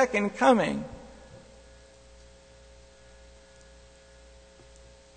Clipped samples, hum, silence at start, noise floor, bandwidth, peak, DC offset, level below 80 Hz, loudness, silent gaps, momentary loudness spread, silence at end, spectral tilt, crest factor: under 0.1%; 60 Hz at -55 dBFS; 0 s; -53 dBFS; 9.4 kHz; -8 dBFS; under 0.1%; -56 dBFS; -25 LUFS; none; 29 LU; 4.1 s; -5 dB/octave; 24 dB